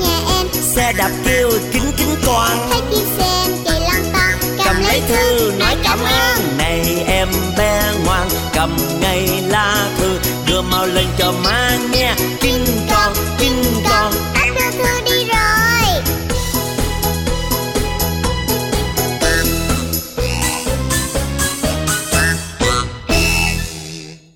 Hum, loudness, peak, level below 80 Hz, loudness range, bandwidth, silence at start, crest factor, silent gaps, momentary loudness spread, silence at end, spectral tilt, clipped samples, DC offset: none; -15 LUFS; 0 dBFS; -24 dBFS; 3 LU; 17 kHz; 0 s; 14 dB; none; 5 LU; 0.15 s; -3.5 dB/octave; under 0.1%; under 0.1%